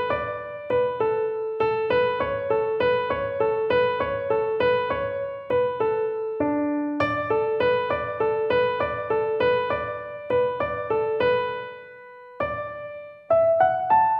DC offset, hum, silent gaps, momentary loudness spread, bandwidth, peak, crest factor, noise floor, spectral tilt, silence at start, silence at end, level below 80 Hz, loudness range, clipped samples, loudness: under 0.1%; none; none; 9 LU; 5.8 kHz; -8 dBFS; 16 dB; -44 dBFS; -8 dB/octave; 0 s; 0 s; -54 dBFS; 2 LU; under 0.1%; -24 LUFS